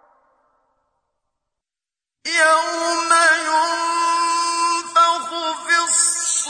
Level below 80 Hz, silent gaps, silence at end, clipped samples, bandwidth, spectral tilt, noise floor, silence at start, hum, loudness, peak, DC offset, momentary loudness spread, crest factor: -72 dBFS; none; 0 s; under 0.1%; 10.5 kHz; 2 dB/octave; -90 dBFS; 2.25 s; none; -17 LUFS; -2 dBFS; under 0.1%; 7 LU; 16 dB